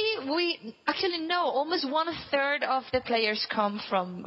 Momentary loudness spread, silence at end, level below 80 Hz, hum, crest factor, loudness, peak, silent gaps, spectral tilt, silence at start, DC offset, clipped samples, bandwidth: 4 LU; 0 s; -62 dBFS; none; 18 dB; -28 LUFS; -10 dBFS; none; -6 dB/octave; 0 s; under 0.1%; under 0.1%; 7.8 kHz